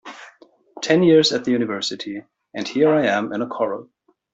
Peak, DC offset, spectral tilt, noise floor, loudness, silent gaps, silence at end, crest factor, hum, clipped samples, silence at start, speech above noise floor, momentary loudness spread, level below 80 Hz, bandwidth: -4 dBFS; under 0.1%; -5 dB/octave; -51 dBFS; -19 LUFS; none; 0.5 s; 18 dB; none; under 0.1%; 0.05 s; 32 dB; 18 LU; -66 dBFS; 8 kHz